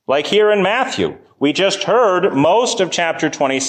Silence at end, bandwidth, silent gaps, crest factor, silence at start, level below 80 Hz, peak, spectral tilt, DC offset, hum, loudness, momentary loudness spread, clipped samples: 0 s; 9.8 kHz; none; 12 dB; 0.1 s; -56 dBFS; -4 dBFS; -3.5 dB/octave; under 0.1%; none; -15 LUFS; 6 LU; under 0.1%